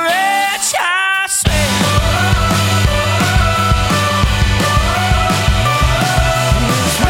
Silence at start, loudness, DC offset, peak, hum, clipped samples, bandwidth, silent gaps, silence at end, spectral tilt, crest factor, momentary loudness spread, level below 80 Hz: 0 s; -13 LUFS; under 0.1%; 0 dBFS; none; under 0.1%; 17 kHz; none; 0 s; -4 dB/octave; 12 dB; 1 LU; -20 dBFS